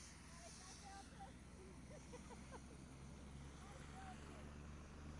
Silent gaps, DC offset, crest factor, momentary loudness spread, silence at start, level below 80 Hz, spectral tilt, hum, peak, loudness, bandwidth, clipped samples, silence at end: none; under 0.1%; 14 dB; 3 LU; 0 s; -62 dBFS; -4.5 dB/octave; none; -44 dBFS; -58 LUFS; 11.5 kHz; under 0.1%; 0 s